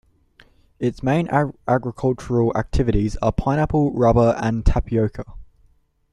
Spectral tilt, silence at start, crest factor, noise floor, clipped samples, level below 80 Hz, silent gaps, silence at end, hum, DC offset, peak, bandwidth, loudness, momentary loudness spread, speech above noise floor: -8 dB/octave; 0.8 s; 18 dB; -58 dBFS; under 0.1%; -30 dBFS; none; 0.7 s; none; under 0.1%; -2 dBFS; 11 kHz; -20 LUFS; 7 LU; 39 dB